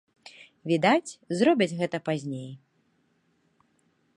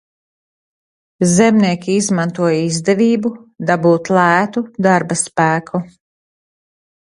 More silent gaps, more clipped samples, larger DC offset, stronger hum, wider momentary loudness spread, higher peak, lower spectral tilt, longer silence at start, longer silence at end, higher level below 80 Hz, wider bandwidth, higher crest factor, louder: neither; neither; neither; neither; first, 20 LU vs 8 LU; second, -8 dBFS vs 0 dBFS; about the same, -5.5 dB/octave vs -5 dB/octave; second, 0.25 s vs 1.2 s; first, 1.6 s vs 1.3 s; second, -76 dBFS vs -58 dBFS; about the same, 11.5 kHz vs 11.5 kHz; first, 22 dB vs 16 dB; second, -26 LUFS vs -15 LUFS